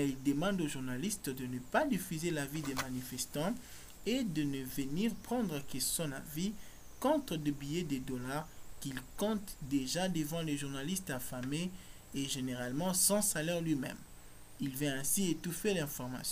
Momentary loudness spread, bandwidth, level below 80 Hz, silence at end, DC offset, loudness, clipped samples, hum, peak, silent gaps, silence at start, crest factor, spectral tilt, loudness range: 10 LU; 16 kHz; -56 dBFS; 0 s; under 0.1%; -36 LUFS; under 0.1%; none; -16 dBFS; none; 0 s; 20 dB; -4 dB/octave; 4 LU